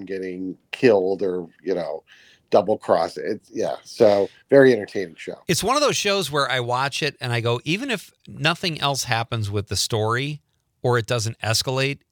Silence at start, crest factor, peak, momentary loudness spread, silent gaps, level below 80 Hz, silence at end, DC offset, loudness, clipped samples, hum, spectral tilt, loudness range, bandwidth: 0 s; 20 dB; -2 dBFS; 12 LU; none; -60 dBFS; 0.15 s; under 0.1%; -22 LUFS; under 0.1%; none; -4.5 dB/octave; 4 LU; 19.5 kHz